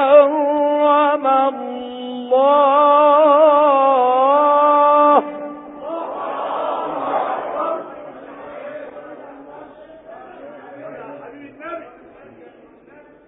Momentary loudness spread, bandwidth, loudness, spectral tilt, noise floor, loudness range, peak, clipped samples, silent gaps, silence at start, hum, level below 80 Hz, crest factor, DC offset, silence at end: 24 LU; 4 kHz; -15 LUFS; -9 dB/octave; -46 dBFS; 23 LU; 0 dBFS; under 0.1%; none; 0 s; none; -68 dBFS; 16 dB; under 0.1%; 1.4 s